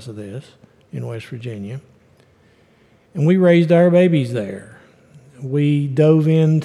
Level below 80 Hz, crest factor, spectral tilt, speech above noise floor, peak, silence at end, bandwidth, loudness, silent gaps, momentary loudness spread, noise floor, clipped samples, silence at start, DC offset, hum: -66 dBFS; 16 dB; -9 dB/octave; 38 dB; -2 dBFS; 0 s; 10.5 kHz; -15 LUFS; none; 21 LU; -54 dBFS; under 0.1%; 0 s; under 0.1%; none